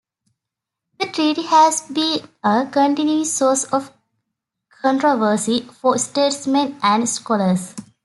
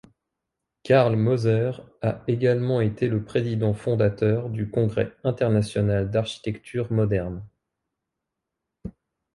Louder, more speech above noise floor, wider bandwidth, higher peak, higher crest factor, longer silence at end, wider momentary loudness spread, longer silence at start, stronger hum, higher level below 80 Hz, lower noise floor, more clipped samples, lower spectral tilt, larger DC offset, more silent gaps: first, -18 LUFS vs -24 LUFS; first, 66 dB vs 61 dB; about the same, 12 kHz vs 11.5 kHz; first, -2 dBFS vs -6 dBFS; about the same, 16 dB vs 18 dB; second, 0.25 s vs 0.45 s; about the same, 7 LU vs 9 LU; first, 1 s vs 0.85 s; neither; second, -68 dBFS vs -50 dBFS; about the same, -83 dBFS vs -84 dBFS; neither; second, -3.5 dB/octave vs -8 dB/octave; neither; neither